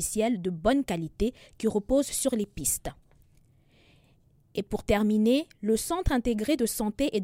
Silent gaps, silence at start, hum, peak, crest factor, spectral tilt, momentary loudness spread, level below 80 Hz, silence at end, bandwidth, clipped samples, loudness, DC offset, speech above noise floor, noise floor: none; 0 s; none; -10 dBFS; 18 dB; -4.5 dB/octave; 8 LU; -42 dBFS; 0 s; 16.5 kHz; under 0.1%; -28 LUFS; under 0.1%; 35 dB; -62 dBFS